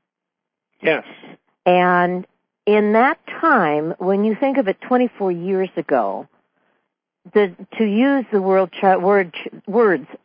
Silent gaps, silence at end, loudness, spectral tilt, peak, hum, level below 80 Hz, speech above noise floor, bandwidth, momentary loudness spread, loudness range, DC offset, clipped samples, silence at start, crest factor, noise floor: none; 0.1 s; -18 LUFS; -11.5 dB/octave; -2 dBFS; none; -74 dBFS; 65 dB; 5.2 kHz; 8 LU; 4 LU; under 0.1%; under 0.1%; 0.8 s; 16 dB; -83 dBFS